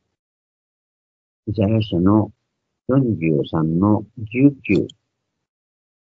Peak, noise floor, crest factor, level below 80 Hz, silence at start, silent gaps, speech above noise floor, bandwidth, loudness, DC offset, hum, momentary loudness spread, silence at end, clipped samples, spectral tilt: -2 dBFS; -76 dBFS; 20 dB; -52 dBFS; 1.45 s; none; 58 dB; 7.2 kHz; -19 LUFS; under 0.1%; none; 12 LU; 1.3 s; under 0.1%; -9.5 dB/octave